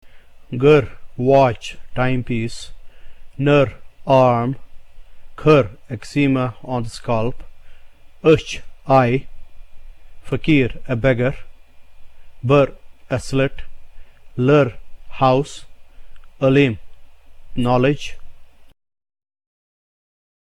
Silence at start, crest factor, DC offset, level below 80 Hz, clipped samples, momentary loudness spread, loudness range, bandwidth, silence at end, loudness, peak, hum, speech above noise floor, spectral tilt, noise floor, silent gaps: 0.05 s; 18 dB; under 0.1%; -38 dBFS; under 0.1%; 17 LU; 4 LU; 11.5 kHz; 1.75 s; -18 LUFS; -2 dBFS; none; 22 dB; -7 dB/octave; -38 dBFS; none